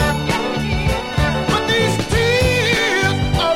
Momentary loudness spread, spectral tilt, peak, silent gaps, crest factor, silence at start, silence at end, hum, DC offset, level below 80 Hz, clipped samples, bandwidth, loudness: 5 LU; -4.5 dB/octave; -4 dBFS; none; 14 dB; 0 s; 0 s; none; 0.4%; -28 dBFS; under 0.1%; 16.5 kHz; -17 LUFS